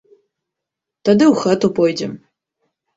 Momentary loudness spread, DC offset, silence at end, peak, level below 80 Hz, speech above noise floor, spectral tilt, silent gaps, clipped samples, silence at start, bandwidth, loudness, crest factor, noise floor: 12 LU; under 0.1%; 0.8 s; -2 dBFS; -60 dBFS; 68 dB; -6 dB/octave; none; under 0.1%; 1.05 s; 8 kHz; -15 LUFS; 16 dB; -83 dBFS